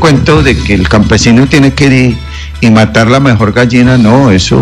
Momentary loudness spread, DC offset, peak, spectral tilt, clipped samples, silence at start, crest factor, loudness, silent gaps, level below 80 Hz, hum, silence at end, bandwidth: 4 LU; under 0.1%; 0 dBFS; -6 dB/octave; 2%; 0 s; 6 dB; -6 LUFS; none; -20 dBFS; none; 0 s; 11.5 kHz